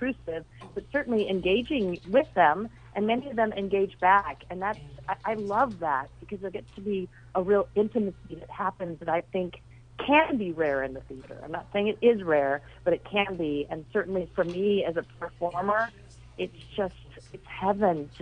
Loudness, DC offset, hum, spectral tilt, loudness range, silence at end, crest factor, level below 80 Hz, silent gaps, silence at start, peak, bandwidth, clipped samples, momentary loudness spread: -28 LUFS; under 0.1%; none; -7 dB/octave; 4 LU; 0 s; 20 dB; -54 dBFS; none; 0 s; -8 dBFS; 9.6 kHz; under 0.1%; 15 LU